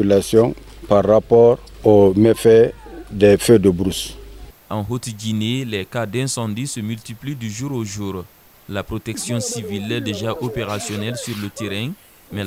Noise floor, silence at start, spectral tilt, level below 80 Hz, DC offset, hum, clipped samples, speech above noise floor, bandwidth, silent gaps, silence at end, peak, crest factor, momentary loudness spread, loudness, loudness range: -39 dBFS; 0 s; -5.5 dB/octave; -44 dBFS; under 0.1%; none; under 0.1%; 21 dB; 16 kHz; none; 0 s; 0 dBFS; 18 dB; 16 LU; -18 LUFS; 12 LU